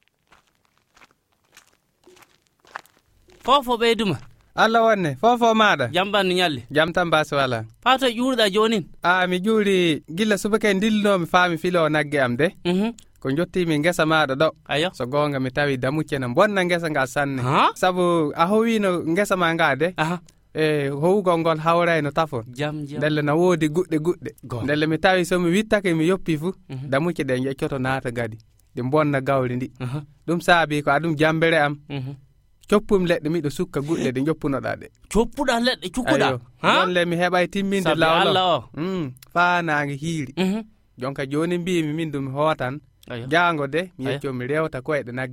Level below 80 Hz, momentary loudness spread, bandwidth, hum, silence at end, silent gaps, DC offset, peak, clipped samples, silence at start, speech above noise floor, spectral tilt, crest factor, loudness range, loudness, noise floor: -48 dBFS; 10 LU; 16.5 kHz; none; 0 s; none; under 0.1%; -2 dBFS; under 0.1%; 3.45 s; 44 dB; -5.5 dB/octave; 18 dB; 4 LU; -21 LUFS; -65 dBFS